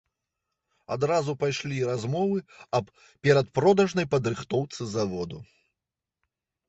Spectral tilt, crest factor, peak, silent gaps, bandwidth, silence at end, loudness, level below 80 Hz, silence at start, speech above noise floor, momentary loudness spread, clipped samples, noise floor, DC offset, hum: -6 dB/octave; 20 dB; -8 dBFS; none; 8.2 kHz; 1.25 s; -26 LUFS; -60 dBFS; 0.9 s; 62 dB; 12 LU; under 0.1%; -88 dBFS; under 0.1%; none